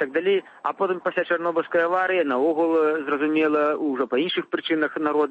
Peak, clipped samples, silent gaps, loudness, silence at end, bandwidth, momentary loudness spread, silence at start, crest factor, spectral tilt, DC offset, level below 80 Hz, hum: -8 dBFS; under 0.1%; none; -23 LUFS; 0 s; 5 kHz; 4 LU; 0 s; 14 dB; -6.5 dB/octave; under 0.1%; -76 dBFS; none